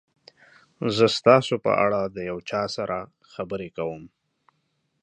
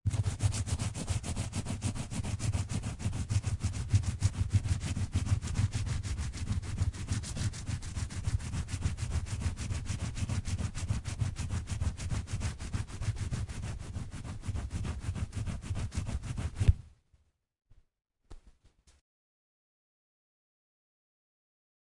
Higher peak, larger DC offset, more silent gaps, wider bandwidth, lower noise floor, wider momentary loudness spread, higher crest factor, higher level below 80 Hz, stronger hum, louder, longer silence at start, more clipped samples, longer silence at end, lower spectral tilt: first, -2 dBFS vs -10 dBFS; neither; neither; second, 10 kHz vs 11.5 kHz; about the same, -73 dBFS vs -70 dBFS; first, 15 LU vs 7 LU; about the same, 24 dB vs 24 dB; second, -60 dBFS vs -42 dBFS; neither; first, -24 LUFS vs -36 LUFS; first, 0.8 s vs 0.05 s; neither; second, 0.95 s vs 3.3 s; about the same, -5.5 dB/octave vs -5 dB/octave